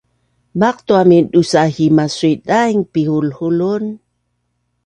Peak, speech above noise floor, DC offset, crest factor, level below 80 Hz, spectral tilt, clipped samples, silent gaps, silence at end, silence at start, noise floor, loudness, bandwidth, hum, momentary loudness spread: 0 dBFS; 54 dB; under 0.1%; 14 dB; -54 dBFS; -6.5 dB/octave; under 0.1%; none; 0.9 s; 0.55 s; -68 dBFS; -14 LUFS; 10.5 kHz; 60 Hz at -45 dBFS; 9 LU